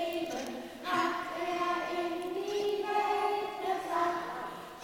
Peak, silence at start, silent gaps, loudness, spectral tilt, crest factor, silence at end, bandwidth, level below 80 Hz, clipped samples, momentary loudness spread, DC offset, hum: -18 dBFS; 0 s; none; -33 LUFS; -3.5 dB/octave; 16 dB; 0 s; 19 kHz; -68 dBFS; under 0.1%; 8 LU; under 0.1%; none